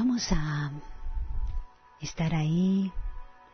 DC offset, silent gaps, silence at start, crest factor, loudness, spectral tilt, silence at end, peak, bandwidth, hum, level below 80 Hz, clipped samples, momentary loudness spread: under 0.1%; none; 0 s; 14 dB; -30 LUFS; -6 dB/octave; 0.15 s; -14 dBFS; 6.6 kHz; none; -36 dBFS; under 0.1%; 17 LU